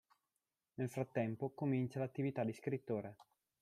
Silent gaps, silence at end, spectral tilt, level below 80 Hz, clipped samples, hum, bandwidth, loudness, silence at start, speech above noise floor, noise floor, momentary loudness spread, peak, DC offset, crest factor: none; 0.45 s; -8.5 dB/octave; -80 dBFS; under 0.1%; none; 13.5 kHz; -41 LUFS; 0.8 s; over 49 dB; under -90 dBFS; 6 LU; -24 dBFS; under 0.1%; 18 dB